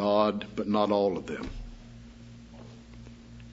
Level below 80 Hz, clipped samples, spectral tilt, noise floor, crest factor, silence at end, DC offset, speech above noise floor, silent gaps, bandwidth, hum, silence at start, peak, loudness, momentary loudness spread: -50 dBFS; under 0.1%; -7 dB/octave; -48 dBFS; 20 dB; 0 s; under 0.1%; 19 dB; none; 8 kHz; none; 0 s; -12 dBFS; -29 LUFS; 23 LU